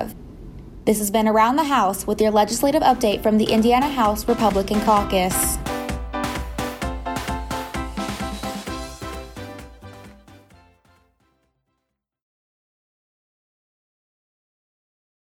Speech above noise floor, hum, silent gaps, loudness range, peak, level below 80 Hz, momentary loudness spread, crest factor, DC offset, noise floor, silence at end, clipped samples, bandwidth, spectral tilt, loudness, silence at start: 59 dB; none; none; 16 LU; -4 dBFS; -38 dBFS; 19 LU; 20 dB; under 0.1%; -77 dBFS; 5 s; under 0.1%; 17 kHz; -4.5 dB/octave; -21 LUFS; 0 s